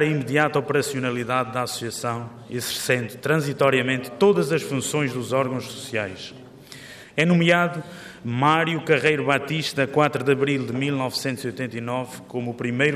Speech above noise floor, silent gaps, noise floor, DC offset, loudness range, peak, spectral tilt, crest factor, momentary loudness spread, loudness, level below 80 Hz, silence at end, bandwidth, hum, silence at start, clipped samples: 20 dB; none; -43 dBFS; under 0.1%; 3 LU; -4 dBFS; -5 dB/octave; 18 dB; 12 LU; -23 LUFS; -64 dBFS; 0 s; 15.5 kHz; none; 0 s; under 0.1%